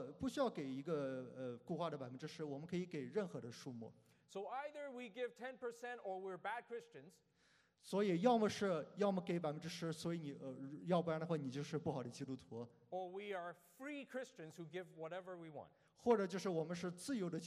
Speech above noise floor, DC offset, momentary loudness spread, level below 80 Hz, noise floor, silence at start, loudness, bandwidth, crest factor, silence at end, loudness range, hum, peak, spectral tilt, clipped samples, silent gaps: 32 dB; under 0.1%; 15 LU; -82 dBFS; -76 dBFS; 0 s; -44 LUFS; 13.5 kHz; 22 dB; 0 s; 9 LU; none; -22 dBFS; -6 dB/octave; under 0.1%; none